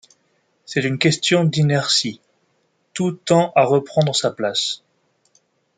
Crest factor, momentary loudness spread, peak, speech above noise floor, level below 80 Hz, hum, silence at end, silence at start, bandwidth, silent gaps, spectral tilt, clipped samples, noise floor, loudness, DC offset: 20 dB; 9 LU; -2 dBFS; 48 dB; -62 dBFS; none; 1 s; 0.7 s; 9.6 kHz; none; -4.5 dB/octave; under 0.1%; -66 dBFS; -18 LUFS; under 0.1%